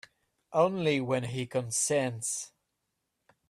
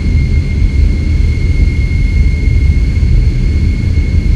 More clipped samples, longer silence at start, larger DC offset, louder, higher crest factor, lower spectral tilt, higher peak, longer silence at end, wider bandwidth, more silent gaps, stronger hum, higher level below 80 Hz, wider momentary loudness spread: second, under 0.1% vs 0.5%; first, 0.5 s vs 0 s; neither; second, -30 LUFS vs -12 LUFS; first, 20 dB vs 10 dB; second, -4 dB/octave vs -7.5 dB/octave; second, -12 dBFS vs 0 dBFS; first, 1 s vs 0 s; first, 14.5 kHz vs 7.8 kHz; neither; neither; second, -70 dBFS vs -10 dBFS; first, 7 LU vs 2 LU